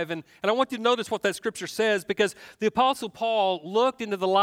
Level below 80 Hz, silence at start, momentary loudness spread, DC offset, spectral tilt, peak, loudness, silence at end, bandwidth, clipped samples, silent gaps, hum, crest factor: -68 dBFS; 0 s; 5 LU; under 0.1%; -3.5 dB/octave; -8 dBFS; -26 LUFS; 0 s; 16.5 kHz; under 0.1%; none; none; 18 dB